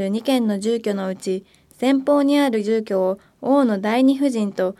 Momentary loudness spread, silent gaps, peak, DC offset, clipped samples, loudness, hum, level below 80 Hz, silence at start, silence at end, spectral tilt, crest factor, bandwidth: 8 LU; none; -6 dBFS; under 0.1%; under 0.1%; -20 LUFS; none; -66 dBFS; 0 s; 0.05 s; -6 dB/octave; 14 dB; 14 kHz